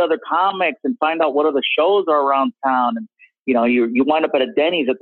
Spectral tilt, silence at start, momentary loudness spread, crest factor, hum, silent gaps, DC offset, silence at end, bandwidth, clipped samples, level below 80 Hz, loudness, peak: -7.5 dB/octave; 0 s; 4 LU; 14 dB; none; none; under 0.1%; 0.05 s; 4.3 kHz; under 0.1%; -70 dBFS; -17 LUFS; -4 dBFS